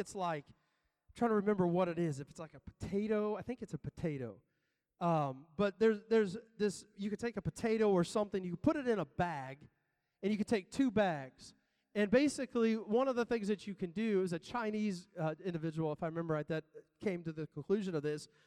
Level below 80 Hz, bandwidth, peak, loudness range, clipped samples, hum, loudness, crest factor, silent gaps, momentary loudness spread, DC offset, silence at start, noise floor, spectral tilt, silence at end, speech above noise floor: -68 dBFS; 12 kHz; -18 dBFS; 5 LU; under 0.1%; none; -36 LUFS; 20 dB; none; 12 LU; under 0.1%; 0 s; -84 dBFS; -6.5 dB/octave; 0.2 s; 48 dB